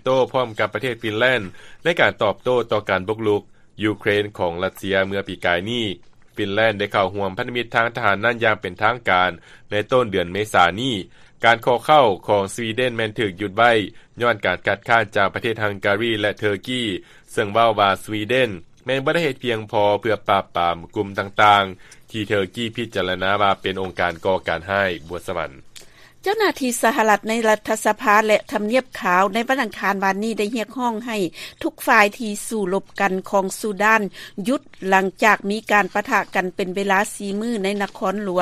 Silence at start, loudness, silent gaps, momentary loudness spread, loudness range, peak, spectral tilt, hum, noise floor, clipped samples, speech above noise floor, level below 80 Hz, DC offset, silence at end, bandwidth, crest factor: 0.05 s; -20 LUFS; none; 9 LU; 3 LU; 0 dBFS; -4.5 dB/octave; none; -44 dBFS; under 0.1%; 24 dB; -54 dBFS; under 0.1%; 0 s; 15 kHz; 20 dB